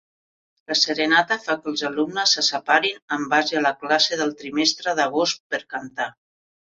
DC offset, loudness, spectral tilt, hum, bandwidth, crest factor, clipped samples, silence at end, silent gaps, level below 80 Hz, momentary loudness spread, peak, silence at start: under 0.1%; -21 LUFS; -1.5 dB/octave; none; 7.8 kHz; 20 dB; under 0.1%; 0.65 s; 3.02-3.08 s, 5.40-5.50 s; -70 dBFS; 10 LU; -4 dBFS; 0.7 s